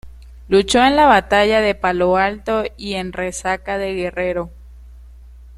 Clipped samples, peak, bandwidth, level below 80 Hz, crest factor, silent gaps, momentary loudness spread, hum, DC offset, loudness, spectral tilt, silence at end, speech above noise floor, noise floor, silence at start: under 0.1%; 0 dBFS; 13 kHz; -38 dBFS; 18 dB; none; 12 LU; none; under 0.1%; -17 LUFS; -4 dB/octave; 0 s; 23 dB; -40 dBFS; 0.05 s